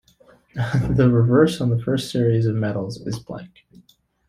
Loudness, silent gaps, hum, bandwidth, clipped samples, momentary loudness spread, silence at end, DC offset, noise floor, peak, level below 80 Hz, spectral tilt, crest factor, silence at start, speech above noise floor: -20 LUFS; none; none; 14 kHz; under 0.1%; 15 LU; 0.8 s; under 0.1%; -55 dBFS; -4 dBFS; -44 dBFS; -7.5 dB/octave; 16 dB; 0.55 s; 36 dB